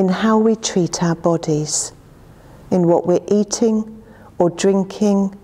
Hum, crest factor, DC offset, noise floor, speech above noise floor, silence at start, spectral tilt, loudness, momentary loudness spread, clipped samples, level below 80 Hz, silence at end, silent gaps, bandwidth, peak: none; 16 dB; under 0.1%; -43 dBFS; 27 dB; 0 s; -5.5 dB/octave; -17 LUFS; 6 LU; under 0.1%; -50 dBFS; 0.05 s; none; 12.5 kHz; 0 dBFS